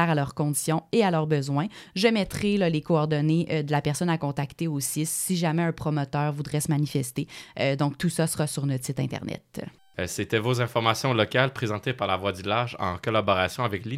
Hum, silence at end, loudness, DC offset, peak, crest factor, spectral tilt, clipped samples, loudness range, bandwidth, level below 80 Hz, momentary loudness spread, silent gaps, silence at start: none; 0 s; -26 LUFS; under 0.1%; -4 dBFS; 20 dB; -5 dB/octave; under 0.1%; 3 LU; 16 kHz; -58 dBFS; 7 LU; none; 0 s